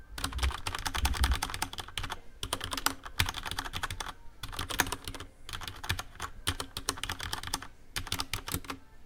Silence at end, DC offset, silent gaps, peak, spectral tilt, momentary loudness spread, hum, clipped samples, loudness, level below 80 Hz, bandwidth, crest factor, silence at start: 0 s; under 0.1%; none; -6 dBFS; -2.5 dB/octave; 10 LU; none; under 0.1%; -35 LUFS; -40 dBFS; 18 kHz; 28 dB; 0 s